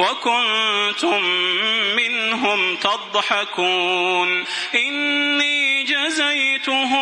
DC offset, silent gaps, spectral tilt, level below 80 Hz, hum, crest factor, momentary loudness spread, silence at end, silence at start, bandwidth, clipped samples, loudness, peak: under 0.1%; none; -1.5 dB/octave; -72 dBFS; none; 18 dB; 3 LU; 0 s; 0 s; 11 kHz; under 0.1%; -18 LUFS; -2 dBFS